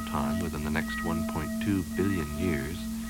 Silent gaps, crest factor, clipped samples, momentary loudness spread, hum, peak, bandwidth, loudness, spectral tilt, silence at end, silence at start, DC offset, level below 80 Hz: none; 16 dB; under 0.1%; 2 LU; none; -14 dBFS; 18 kHz; -30 LUFS; -5.5 dB/octave; 0 s; 0 s; under 0.1%; -42 dBFS